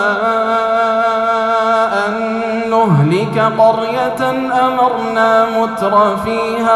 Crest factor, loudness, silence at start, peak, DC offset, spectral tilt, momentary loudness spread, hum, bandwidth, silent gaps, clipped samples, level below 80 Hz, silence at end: 12 dB; -13 LUFS; 0 s; 0 dBFS; under 0.1%; -6.5 dB/octave; 5 LU; none; 13.5 kHz; none; under 0.1%; -50 dBFS; 0 s